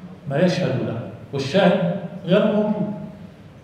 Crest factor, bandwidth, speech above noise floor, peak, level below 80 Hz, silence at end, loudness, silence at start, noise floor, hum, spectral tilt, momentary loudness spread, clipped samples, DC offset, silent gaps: 18 dB; 9 kHz; 22 dB; -2 dBFS; -58 dBFS; 0.05 s; -21 LUFS; 0 s; -41 dBFS; none; -7 dB/octave; 14 LU; under 0.1%; under 0.1%; none